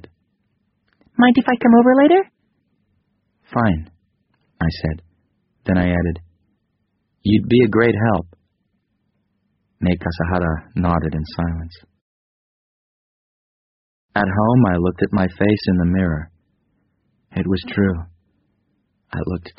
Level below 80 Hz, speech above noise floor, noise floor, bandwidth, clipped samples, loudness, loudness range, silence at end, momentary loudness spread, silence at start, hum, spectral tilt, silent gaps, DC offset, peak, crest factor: -40 dBFS; 53 dB; -69 dBFS; 5.6 kHz; under 0.1%; -18 LUFS; 9 LU; 0.1 s; 15 LU; 1.15 s; none; -6.5 dB/octave; 12.01-14.09 s; under 0.1%; -2 dBFS; 18 dB